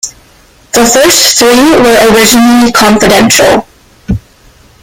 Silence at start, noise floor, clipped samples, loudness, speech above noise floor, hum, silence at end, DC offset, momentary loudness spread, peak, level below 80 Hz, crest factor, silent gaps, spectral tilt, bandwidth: 0.05 s; -40 dBFS; 1%; -4 LUFS; 36 dB; none; 0.65 s; under 0.1%; 14 LU; 0 dBFS; -30 dBFS; 6 dB; none; -2.5 dB/octave; over 20 kHz